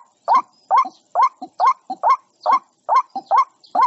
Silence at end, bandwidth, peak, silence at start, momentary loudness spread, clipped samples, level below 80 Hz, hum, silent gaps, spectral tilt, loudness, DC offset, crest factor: 0 s; 7.8 kHz; -6 dBFS; 0.3 s; 2 LU; under 0.1%; -82 dBFS; none; none; -2 dB/octave; -19 LUFS; under 0.1%; 12 dB